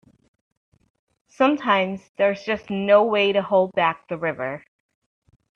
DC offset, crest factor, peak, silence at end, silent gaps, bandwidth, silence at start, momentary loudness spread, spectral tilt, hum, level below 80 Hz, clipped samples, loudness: under 0.1%; 20 dB; -4 dBFS; 0.95 s; 2.09-2.15 s; 6.8 kHz; 1.4 s; 10 LU; -6.5 dB/octave; none; -64 dBFS; under 0.1%; -21 LUFS